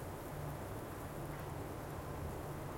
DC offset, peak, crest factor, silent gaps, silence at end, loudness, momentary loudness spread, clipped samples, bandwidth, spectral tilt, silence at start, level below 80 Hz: under 0.1%; -32 dBFS; 12 dB; none; 0 s; -46 LUFS; 1 LU; under 0.1%; 16.5 kHz; -6 dB/octave; 0 s; -56 dBFS